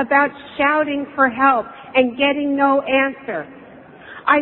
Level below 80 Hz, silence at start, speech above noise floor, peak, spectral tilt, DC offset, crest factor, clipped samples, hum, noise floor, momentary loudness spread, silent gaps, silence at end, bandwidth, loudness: -58 dBFS; 0 s; 23 dB; 0 dBFS; -8 dB/octave; under 0.1%; 18 dB; under 0.1%; none; -41 dBFS; 12 LU; none; 0 s; 4.2 kHz; -18 LUFS